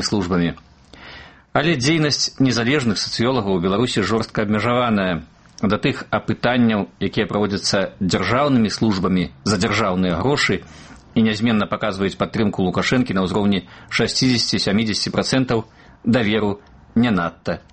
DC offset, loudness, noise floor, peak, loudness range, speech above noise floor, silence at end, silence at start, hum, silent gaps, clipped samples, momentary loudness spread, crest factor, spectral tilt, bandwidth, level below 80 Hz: under 0.1%; -19 LUFS; -41 dBFS; -2 dBFS; 1 LU; 22 dB; 0.15 s; 0 s; none; none; under 0.1%; 7 LU; 18 dB; -5 dB/octave; 8.8 kHz; -46 dBFS